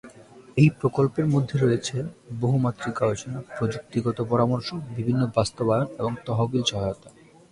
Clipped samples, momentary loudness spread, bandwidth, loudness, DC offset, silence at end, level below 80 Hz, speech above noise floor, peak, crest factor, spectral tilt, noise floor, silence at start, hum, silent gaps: under 0.1%; 10 LU; 11 kHz; -25 LUFS; under 0.1%; 0.4 s; -52 dBFS; 24 dB; -6 dBFS; 20 dB; -6.5 dB/octave; -48 dBFS; 0.05 s; none; none